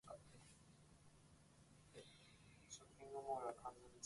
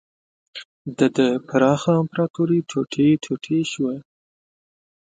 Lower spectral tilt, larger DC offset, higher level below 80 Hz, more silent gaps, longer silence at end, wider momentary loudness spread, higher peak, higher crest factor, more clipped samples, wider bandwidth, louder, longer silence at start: second, -4 dB/octave vs -6.5 dB/octave; neither; second, -78 dBFS vs -62 dBFS; second, none vs 0.65-0.85 s, 2.30-2.34 s; second, 0 s vs 1.05 s; first, 21 LU vs 17 LU; second, -36 dBFS vs -4 dBFS; about the same, 22 dB vs 18 dB; neither; first, 11.5 kHz vs 9.2 kHz; second, -54 LUFS vs -21 LUFS; second, 0.05 s vs 0.55 s